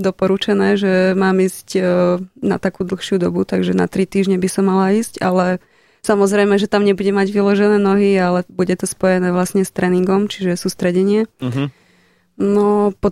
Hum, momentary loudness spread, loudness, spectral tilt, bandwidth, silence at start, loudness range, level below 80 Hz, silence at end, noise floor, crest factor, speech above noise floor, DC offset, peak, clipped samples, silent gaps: none; 6 LU; -16 LUFS; -6 dB/octave; 14 kHz; 0 s; 3 LU; -48 dBFS; 0 s; -55 dBFS; 14 dB; 40 dB; under 0.1%; -2 dBFS; under 0.1%; none